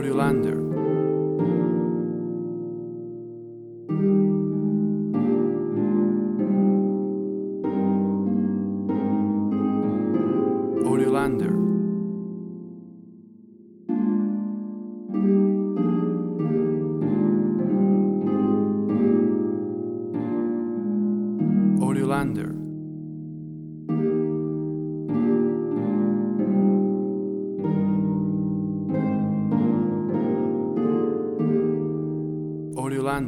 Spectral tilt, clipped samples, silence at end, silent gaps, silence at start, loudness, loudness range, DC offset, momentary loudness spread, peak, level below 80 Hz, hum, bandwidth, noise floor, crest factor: -9.5 dB/octave; under 0.1%; 0 s; none; 0 s; -24 LUFS; 4 LU; under 0.1%; 11 LU; -10 dBFS; -58 dBFS; none; 12 kHz; -48 dBFS; 14 dB